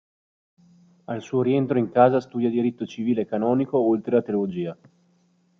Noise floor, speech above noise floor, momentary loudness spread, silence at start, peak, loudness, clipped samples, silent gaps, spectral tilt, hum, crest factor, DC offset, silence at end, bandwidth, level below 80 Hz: -63 dBFS; 41 dB; 11 LU; 1.1 s; -4 dBFS; -23 LUFS; under 0.1%; none; -8.5 dB/octave; none; 20 dB; under 0.1%; 0.85 s; 6.8 kHz; -68 dBFS